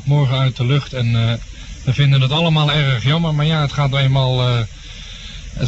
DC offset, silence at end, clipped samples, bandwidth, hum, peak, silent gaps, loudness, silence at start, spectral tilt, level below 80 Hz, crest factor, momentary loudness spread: under 0.1%; 0 s; under 0.1%; 8 kHz; none; -4 dBFS; none; -16 LUFS; 0 s; -6.5 dB/octave; -36 dBFS; 12 dB; 17 LU